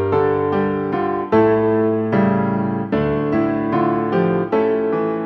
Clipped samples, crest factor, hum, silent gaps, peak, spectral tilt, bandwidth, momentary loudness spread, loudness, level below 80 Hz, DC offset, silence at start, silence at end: under 0.1%; 14 dB; none; none; -2 dBFS; -10.5 dB/octave; 5.8 kHz; 5 LU; -18 LUFS; -48 dBFS; under 0.1%; 0 s; 0 s